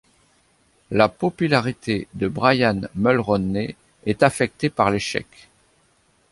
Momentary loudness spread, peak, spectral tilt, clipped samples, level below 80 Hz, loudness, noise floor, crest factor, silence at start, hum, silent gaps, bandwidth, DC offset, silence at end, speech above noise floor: 8 LU; -2 dBFS; -6 dB/octave; under 0.1%; -50 dBFS; -21 LUFS; -61 dBFS; 20 dB; 0.9 s; none; none; 11.5 kHz; under 0.1%; 1.1 s; 41 dB